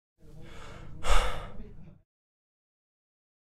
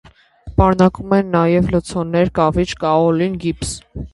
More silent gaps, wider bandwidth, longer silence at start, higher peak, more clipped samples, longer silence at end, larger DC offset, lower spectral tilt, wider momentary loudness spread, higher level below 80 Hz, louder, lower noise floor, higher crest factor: neither; about the same, 12 kHz vs 11.5 kHz; about the same, 0.35 s vs 0.45 s; second, -8 dBFS vs 0 dBFS; neither; first, 1.65 s vs 0.05 s; neither; second, -3.5 dB/octave vs -6.5 dB/octave; first, 24 LU vs 8 LU; about the same, -36 dBFS vs -32 dBFS; second, -33 LUFS vs -16 LUFS; first, -44 dBFS vs -38 dBFS; first, 22 dB vs 16 dB